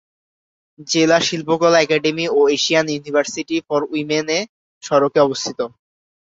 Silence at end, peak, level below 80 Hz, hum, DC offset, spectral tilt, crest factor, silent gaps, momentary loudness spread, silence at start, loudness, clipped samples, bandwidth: 0.7 s; -2 dBFS; -62 dBFS; none; under 0.1%; -3.5 dB/octave; 16 dB; 4.49-4.81 s; 9 LU; 0.8 s; -17 LUFS; under 0.1%; 8 kHz